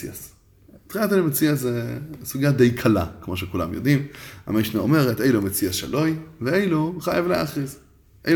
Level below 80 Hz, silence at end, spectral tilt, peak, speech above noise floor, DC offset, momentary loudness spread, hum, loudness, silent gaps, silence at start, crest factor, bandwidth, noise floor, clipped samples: -50 dBFS; 0 s; -6 dB/octave; -4 dBFS; 29 dB; under 0.1%; 13 LU; none; -22 LUFS; none; 0 s; 18 dB; over 20 kHz; -51 dBFS; under 0.1%